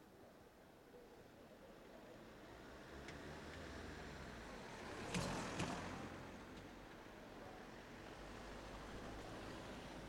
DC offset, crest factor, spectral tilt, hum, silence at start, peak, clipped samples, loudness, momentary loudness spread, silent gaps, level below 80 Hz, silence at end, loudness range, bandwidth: under 0.1%; 24 dB; -4.5 dB/octave; none; 0 s; -28 dBFS; under 0.1%; -52 LUFS; 17 LU; none; -64 dBFS; 0 s; 8 LU; 16.5 kHz